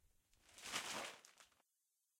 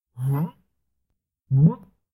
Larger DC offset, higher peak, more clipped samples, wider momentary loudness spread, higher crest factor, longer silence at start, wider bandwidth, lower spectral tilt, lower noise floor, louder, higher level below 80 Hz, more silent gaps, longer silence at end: neither; second, -28 dBFS vs -8 dBFS; neither; first, 23 LU vs 13 LU; first, 26 dB vs 18 dB; about the same, 0.05 s vs 0.15 s; first, 16.5 kHz vs 13 kHz; second, 0 dB/octave vs -11 dB/octave; first, -87 dBFS vs -78 dBFS; second, -48 LUFS vs -23 LUFS; second, -84 dBFS vs -54 dBFS; neither; first, 0.75 s vs 0.35 s